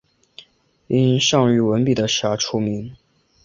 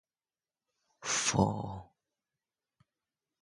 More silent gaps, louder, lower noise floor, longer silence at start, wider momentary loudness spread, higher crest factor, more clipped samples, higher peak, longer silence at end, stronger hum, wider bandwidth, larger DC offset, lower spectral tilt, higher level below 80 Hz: neither; first, -18 LUFS vs -31 LUFS; second, -52 dBFS vs under -90 dBFS; about the same, 0.9 s vs 1 s; second, 9 LU vs 15 LU; second, 18 dB vs 26 dB; neither; first, -2 dBFS vs -12 dBFS; second, 0.5 s vs 1.6 s; neither; second, 7.6 kHz vs 11.5 kHz; neither; first, -5 dB/octave vs -3.5 dB/octave; about the same, -54 dBFS vs -58 dBFS